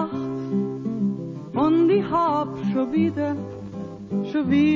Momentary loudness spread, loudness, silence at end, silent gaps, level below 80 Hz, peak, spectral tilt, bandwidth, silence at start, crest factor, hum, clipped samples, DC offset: 13 LU; -23 LUFS; 0 s; none; -54 dBFS; -8 dBFS; -8.5 dB/octave; 7.4 kHz; 0 s; 14 dB; none; under 0.1%; under 0.1%